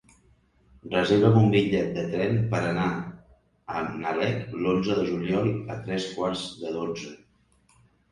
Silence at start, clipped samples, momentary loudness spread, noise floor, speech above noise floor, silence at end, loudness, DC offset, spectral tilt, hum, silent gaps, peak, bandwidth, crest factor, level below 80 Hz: 0.85 s; under 0.1%; 13 LU; -63 dBFS; 38 dB; 0.95 s; -26 LUFS; under 0.1%; -7 dB/octave; none; none; -4 dBFS; 10.5 kHz; 22 dB; -54 dBFS